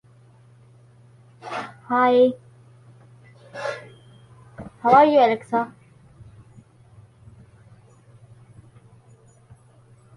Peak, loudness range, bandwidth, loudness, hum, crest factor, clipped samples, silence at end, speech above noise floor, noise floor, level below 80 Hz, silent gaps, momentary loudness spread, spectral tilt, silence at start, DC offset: -4 dBFS; 4 LU; 11 kHz; -20 LUFS; none; 22 dB; under 0.1%; 4.5 s; 36 dB; -53 dBFS; -62 dBFS; none; 26 LU; -6.5 dB/octave; 1.45 s; under 0.1%